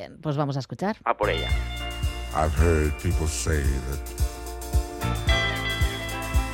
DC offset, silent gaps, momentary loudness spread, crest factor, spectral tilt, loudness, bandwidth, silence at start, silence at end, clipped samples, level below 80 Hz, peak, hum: under 0.1%; none; 8 LU; 18 dB; -5 dB/octave; -26 LUFS; 17 kHz; 0 s; 0 s; under 0.1%; -30 dBFS; -6 dBFS; none